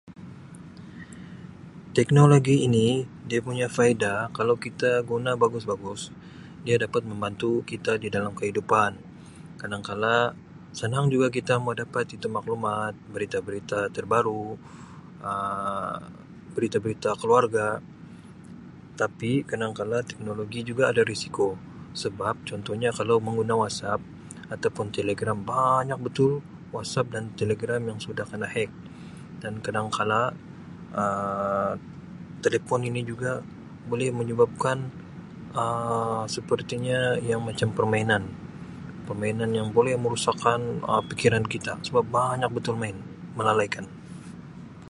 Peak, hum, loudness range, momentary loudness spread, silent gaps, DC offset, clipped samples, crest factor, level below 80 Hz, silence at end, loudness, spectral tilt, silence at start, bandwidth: -2 dBFS; none; 6 LU; 20 LU; none; under 0.1%; under 0.1%; 24 dB; -58 dBFS; 0 s; -26 LUFS; -6 dB/octave; 0.05 s; 11.5 kHz